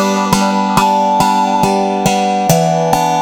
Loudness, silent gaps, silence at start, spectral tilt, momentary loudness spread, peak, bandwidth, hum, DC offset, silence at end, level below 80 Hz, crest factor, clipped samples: -12 LUFS; none; 0 s; -5 dB/octave; 2 LU; 0 dBFS; over 20 kHz; none; under 0.1%; 0 s; -40 dBFS; 12 dB; under 0.1%